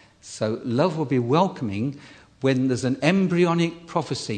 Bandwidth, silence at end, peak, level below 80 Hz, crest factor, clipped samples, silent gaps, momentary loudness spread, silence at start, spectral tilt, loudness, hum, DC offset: 9.4 kHz; 0 s; -2 dBFS; -62 dBFS; 20 dB; under 0.1%; none; 9 LU; 0.25 s; -6.5 dB/octave; -23 LUFS; none; under 0.1%